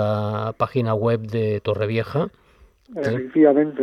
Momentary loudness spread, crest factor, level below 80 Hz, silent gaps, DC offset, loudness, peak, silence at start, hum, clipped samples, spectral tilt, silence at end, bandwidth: 10 LU; 18 dB; -58 dBFS; none; under 0.1%; -21 LUFS; -4 dBFS; 0 s; none; under 0.1%; -9 dB/octave; 0 s; 6.6 kHz